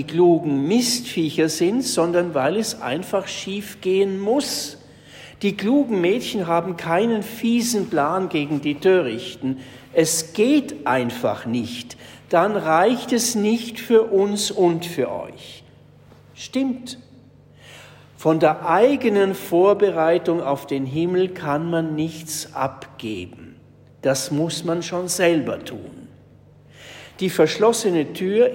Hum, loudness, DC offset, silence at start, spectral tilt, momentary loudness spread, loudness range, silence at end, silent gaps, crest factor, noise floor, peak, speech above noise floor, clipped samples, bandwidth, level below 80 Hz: none; -21 LUFS; under 0.1%; 0 s; -4.5 dB/octave; 14 LU; 6 LU; 0 s; none; 16 dB; -49 dBFS; -4 dBFS; 29 dB; under 0.1%; 16.5 kHz; -62 dBFS